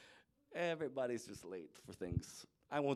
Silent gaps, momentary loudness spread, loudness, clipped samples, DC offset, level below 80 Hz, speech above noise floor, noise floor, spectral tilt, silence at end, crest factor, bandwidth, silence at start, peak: none; 15 LU; -44 LUFS; under 0.1%; under 0.1%; -62 dBFS; 23 dB; -67 dBFS; -5.5 dB/octave; 0 s; 18 dB; 15 kHz; 0 s; -24 dBFS